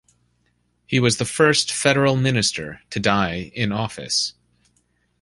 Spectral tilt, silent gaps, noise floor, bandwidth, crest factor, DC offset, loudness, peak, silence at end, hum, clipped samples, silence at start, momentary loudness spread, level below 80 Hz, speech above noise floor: -4 dB/octave; none; -66 dBFS; 11.5 kHz; 20 dB; under 0.1%; -20 LUFS; -2 dBFS; 0.9 s; 60 Hz at -45 dBFS; under 0.1%; 0.9 s; 9 LU; -50 dBFS; 46 dB